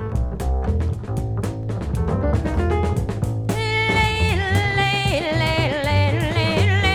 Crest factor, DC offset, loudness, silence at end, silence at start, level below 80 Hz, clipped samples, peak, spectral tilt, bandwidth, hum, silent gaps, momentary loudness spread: 14 dB; under 0.1%; -21 LUFS; 0 s; 0 s; -28 dBFS; under 0.1%; -6 dBFS; -6 dB/octave; 14.5 kHz; none; none; 8 LU